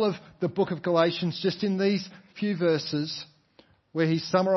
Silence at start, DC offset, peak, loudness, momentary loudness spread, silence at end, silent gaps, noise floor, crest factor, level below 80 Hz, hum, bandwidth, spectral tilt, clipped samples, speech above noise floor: 0 s; under 0.1%; -8 dBFS; -27 LUFS; 10 LU; 0 s; none; -60 dBFS; 18 dB; -70 dBFS; none; 6.2 kHz; -6.5 dB/octave; under 0.1%; 34 dB